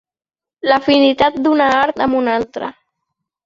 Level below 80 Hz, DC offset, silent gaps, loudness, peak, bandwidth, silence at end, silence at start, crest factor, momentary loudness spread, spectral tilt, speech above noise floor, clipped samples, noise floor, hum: -50 dBFS; under 0.1%; none; -14 LUFS; -2 dBFS; 7.4 kHz; 0.75 s; 0.65 s; 14 dB; 12 LU; -5 dB/octave; 62 dB; under 0.1%; -77 dBFS; none